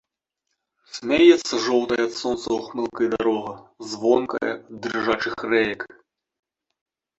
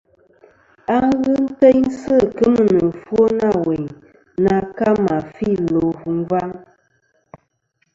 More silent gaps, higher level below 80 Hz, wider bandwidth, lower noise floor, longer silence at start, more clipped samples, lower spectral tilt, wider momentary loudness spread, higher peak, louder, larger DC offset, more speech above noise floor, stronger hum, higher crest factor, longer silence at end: neither; second, -58 dBFS vs -48 dBFS; about the same, 8 kHz vs 7.8 kHz; first, -80 dBFS vs -67 dBFS; about the same, 0.95 s vs 0.9 s; neither; second, -4 dB/octave vs -8.5 dB/octave; first, 18 LU vs 10 LU; about the same, -2 dBFS vs 0 dBFS; second, -22 LUFS vs -17 LUFS; neither; first, 58 dB vs 51 dB; neither; about the same, 22 dB vs 18 dB; about the same, 1.35 s vs 1.35 s